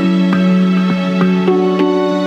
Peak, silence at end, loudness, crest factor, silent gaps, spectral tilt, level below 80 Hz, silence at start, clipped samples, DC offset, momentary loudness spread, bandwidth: -2 dBFS; 0 s; -13 LUFS; 10 dB; none; -8 dB/octave; -54 dBFS; 0 s; under 0.1%; under 0.1%; 2 LU; 7.2 kHz